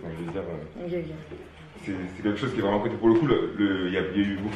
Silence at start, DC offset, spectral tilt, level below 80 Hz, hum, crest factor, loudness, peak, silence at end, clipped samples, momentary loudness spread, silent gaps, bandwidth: 0 s; under 0.1%; -7.5 dB/octave; -50 dBFS; none; 18 dB; -27 LUFS; -8 dBFS; 0 s; under 0.1%; 17 LU; none; 9.2 kHz